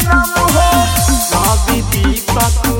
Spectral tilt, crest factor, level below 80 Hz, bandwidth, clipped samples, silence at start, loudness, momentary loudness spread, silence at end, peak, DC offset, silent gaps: -4 dB/octave; 12 dB; -18 dBFS; 17 kHz; under 0.1%; 0 s; -12 LUFS; 4 LU; 0 s; 0 dBFS; under 0.1%; none